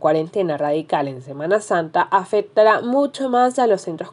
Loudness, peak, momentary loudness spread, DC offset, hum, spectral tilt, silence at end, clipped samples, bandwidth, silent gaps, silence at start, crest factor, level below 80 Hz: -19 LUFS; -2 dBFS; 7 LU; under 0.1%; none; -5.5 dB/octave; 0 s; under 0.1%; 11 kHz; none; 0 s; 16 dB; -76 dBFS